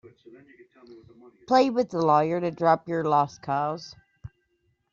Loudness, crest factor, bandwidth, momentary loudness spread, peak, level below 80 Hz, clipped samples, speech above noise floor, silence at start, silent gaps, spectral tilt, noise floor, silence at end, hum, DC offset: -24 LUFS; 20 dB; 7.4 kHz; 8 LU; -6 dBFS; -64 dBFS; under 0.1%; 48 dB; 0.9 s; none; -5 dB/octave; -72 dBFS; 0.65 s; none; under 0.1%